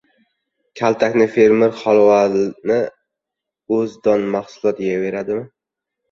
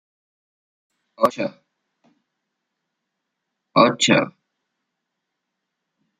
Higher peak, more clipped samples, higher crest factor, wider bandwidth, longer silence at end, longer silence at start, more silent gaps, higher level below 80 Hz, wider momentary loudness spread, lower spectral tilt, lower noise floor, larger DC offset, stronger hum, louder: about the same, -2 dBFS vs -2 dBFS; neither; second, 16 dB vs 24 dB; second, 7.2 kHz vs 13 kHz; second, 0.65 s vs 1.9 s; second, 0.75 s vs 1.2 s; neither; first, -60 dBFS vs -70 dBFS; second, 10 LU vs 14 LU; first, -6.5 dB/octave vs -4 dB/octave; about the same, -83 dBFS vs -80 dBFS; neither; neither; about the same, -17 LUFS vs -19 LUFS